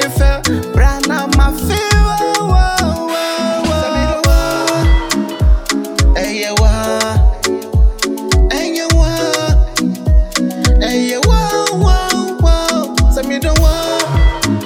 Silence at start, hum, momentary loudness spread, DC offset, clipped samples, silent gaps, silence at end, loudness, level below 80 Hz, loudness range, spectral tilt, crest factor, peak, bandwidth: 0 s; none; 4 LU; under 0.1%; under 0.1%; none; 0 s; -14 LUFS; -14 dBFS; 1 LU; -4.5 dB/octave; 12 dB; 0 dBFS; 17 kHz